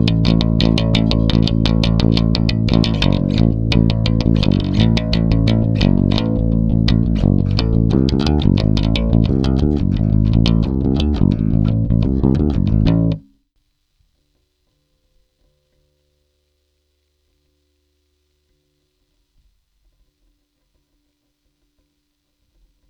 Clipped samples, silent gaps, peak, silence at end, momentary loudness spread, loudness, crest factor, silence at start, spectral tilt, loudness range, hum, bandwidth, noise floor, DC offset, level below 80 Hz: under 0.1%; none; 0 dBFS; 9.7 s; 2 LU; -16 LUFS; 16 dB; 0 s; -8 dB/octave; 4 LU; none; 7.4 kHz; -69 dBFS; under 0.1%; -24 dBFS